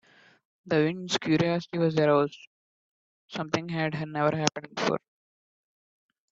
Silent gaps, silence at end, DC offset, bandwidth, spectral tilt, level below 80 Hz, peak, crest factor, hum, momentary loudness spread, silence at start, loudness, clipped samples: 2.47-3.28 s; 1.35 s; under 0.1%; 7.8 kHz; -5 dB/octave; -68 dBFS; -6 dBFS; 24 dB; none; 8 LU; 0.65 s; -27 LUFS; under 0.1%